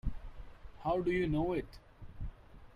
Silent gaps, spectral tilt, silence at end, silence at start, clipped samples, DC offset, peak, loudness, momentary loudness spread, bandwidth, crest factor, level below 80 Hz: none; -8.5 dB/octave; 0 s; 0.05 s; under 0.1%; under 0.1%; -22 dBFS; -35 LUFS; 23 LU; 11 kHz; 16 dB; -46 dBFS